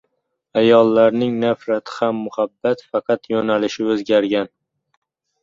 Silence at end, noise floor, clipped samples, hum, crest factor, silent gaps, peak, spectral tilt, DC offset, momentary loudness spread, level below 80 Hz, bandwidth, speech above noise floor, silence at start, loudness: 0.95 s; -72 dBFS; under 0.1%; none; 16 dB; none; -2 dBFS; -6 dB/octave; under 0.1%; 10 LU; -62 dBFS; 7.6 kHz; 55 dB; 0.55 s; -18 LUFS